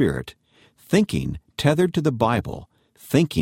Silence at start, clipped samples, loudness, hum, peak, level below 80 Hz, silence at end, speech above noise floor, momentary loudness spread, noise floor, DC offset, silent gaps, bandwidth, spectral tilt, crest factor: 0 s; under 0.1%; -22 LUFS; none; -4 dBFS; -46 dBFS; 0 s; 35 dB; 13 LU; -55 dBFS; under 0.1%; none; 16.5 kHz; -6.5 dB/octave; 18 dB